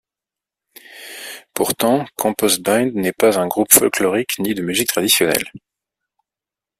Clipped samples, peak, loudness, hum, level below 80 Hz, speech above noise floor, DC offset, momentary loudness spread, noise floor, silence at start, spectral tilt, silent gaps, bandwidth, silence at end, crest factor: under 0.1%; 0 dBFS; -16 LUFS; none; -58 dBFS; 71 dB; under 0.1%; 19 LU; -88 dBFS; 0.9 s; -2.5 dB/octave; none; 16 kHz; 1.2 s; 20 dB